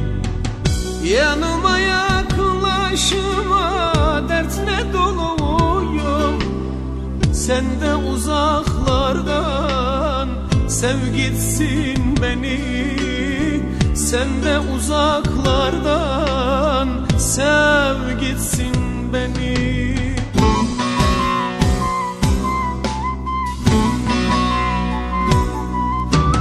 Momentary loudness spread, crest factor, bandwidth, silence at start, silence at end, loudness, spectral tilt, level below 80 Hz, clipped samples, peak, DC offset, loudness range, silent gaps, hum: 5 LU; 16 dB; 14 kHz; 0 s; 0 s; -18 LUFS; -5 dB/octave; -24 dBFS; under 0.1%; -2 dBFS; under 0.1%; 2 LU; none; none